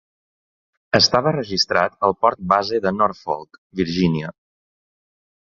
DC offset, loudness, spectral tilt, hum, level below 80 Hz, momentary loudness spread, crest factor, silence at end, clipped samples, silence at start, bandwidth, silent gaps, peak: under 0.1%; -19 LUFS; -4.5 dB/octave; none; -50 dBFS; 12 LU; 22 dB; 1.2 s; under 0.1%; 0.95 s; 7.4 kHz; 3.58-3.70 s; 0 dBFS